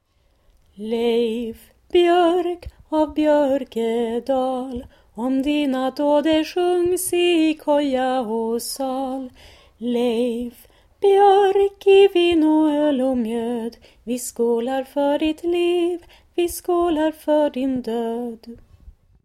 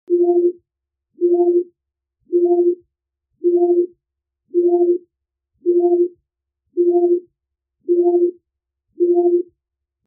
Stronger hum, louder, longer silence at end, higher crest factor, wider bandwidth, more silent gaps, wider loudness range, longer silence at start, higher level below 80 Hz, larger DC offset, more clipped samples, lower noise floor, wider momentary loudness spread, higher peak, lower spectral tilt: neither; second, -20 LUFS vs -17 LUFS; second, 0.35 s vs 0.65 s; about the same, 16 dB vs 12 dB; first, 15.5 kHz vs 0.9 kHz; neither; first, 6 LU vs 1 LU; first, 0.8 s vs 0.1 s; first, -52 dBFS vs -80 dBFS; neither; neither; second, -60 dBFS vs -82 dBFS; first, 14 LU vs 9 LU; about the same, -4 dBFS vs -6 dBFS; first, -4 dB/octave vs 6 dB/octave